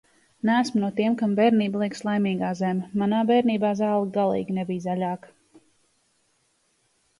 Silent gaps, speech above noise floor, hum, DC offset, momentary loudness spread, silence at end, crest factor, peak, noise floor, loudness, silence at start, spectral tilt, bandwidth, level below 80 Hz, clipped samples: none; 45 dB; none; under 0.1%; 8 LU; 1.95 s; 16 dB; -8 dBFS; -68 dBFS; -24 LUFS; 0.45 s; -7 dB/octave; 11.5 kHz; -68 dBFS; under 0.1%